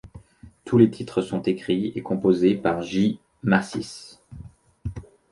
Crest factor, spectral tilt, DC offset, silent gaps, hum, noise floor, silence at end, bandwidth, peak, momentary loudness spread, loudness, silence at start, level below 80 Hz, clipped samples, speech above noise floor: 20 dB; -7 dB/octave; under 0.1%; none; none; -48 dBFS; 0.3 s; 11.5 kHz; -4 dBFS; 23 LU; -23 LUFS; 0.05 s; -50 dBFS; under 0.1%; 26 dB